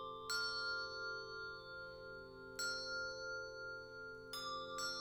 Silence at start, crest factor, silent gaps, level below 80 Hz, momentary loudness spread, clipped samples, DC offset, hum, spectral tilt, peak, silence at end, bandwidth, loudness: 0 s; 18 dB; none; -70 dBFS; 11 LU; under 0.1%; under 0.1%; none; -1.5 dB/octave; -28 dBFS; 0 s; over 20 kHz; -45 LUFS